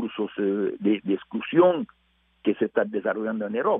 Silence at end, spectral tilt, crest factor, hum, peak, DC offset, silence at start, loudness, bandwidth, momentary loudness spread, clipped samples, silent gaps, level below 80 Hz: 0 s; -5 dB/octave; 18 dB; none; -6 dBFS; under 0.1%; 0 s; -25 LUFS; 3.8 kHz; 10 LU; under 0.1%; none; -70 dBFS